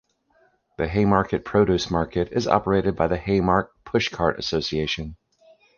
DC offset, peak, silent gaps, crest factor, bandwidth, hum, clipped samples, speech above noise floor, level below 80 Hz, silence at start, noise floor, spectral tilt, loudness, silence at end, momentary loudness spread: under 0.1%; -2 dBFS; none; 20 dB; 7.2 kHz; none; under 0.1%; 41 dB; -42 dBFS; 0.8 s; -63 dBFS; -6 dB/octave; -23 LUFS; 0.65 s; 6 LU